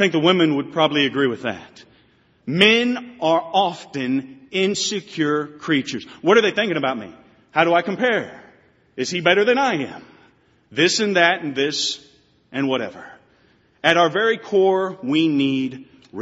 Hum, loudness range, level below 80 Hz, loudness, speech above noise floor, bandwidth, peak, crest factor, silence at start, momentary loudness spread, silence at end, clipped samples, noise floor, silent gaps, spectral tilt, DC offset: none; 2 LU; -66 dBFS; -19 LUFS; 38 dB; 8 kHz; 0 dBFS; 20 dB; 0 s; 13 LU; 0 s; under 0.1%; -58 dBFS; none; -2.5 dB/octave; under 0.1%